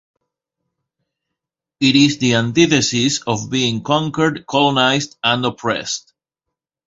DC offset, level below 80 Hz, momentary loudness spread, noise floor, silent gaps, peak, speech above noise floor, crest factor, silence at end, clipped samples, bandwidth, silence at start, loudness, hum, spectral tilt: under 0.1%; -54 dBFS; 7 LU; -82 dBFS; none; 0 dBFS; 66 dB; 18 dB; 0.9 s; under 0.1%; 7.8 kHz; 1.8 s; -16 LUFS; none; -4 dB/octave